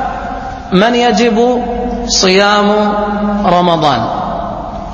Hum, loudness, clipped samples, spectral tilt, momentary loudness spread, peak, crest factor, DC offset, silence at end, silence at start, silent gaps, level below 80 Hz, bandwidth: none; -12 LUFS; under 0.1%; -4.5 dB/octave; 12 LU; 0 dBFS; 12 dB; under 0.1%; 0 s; 0 s; none; -30 dBFS; 8.2 kHz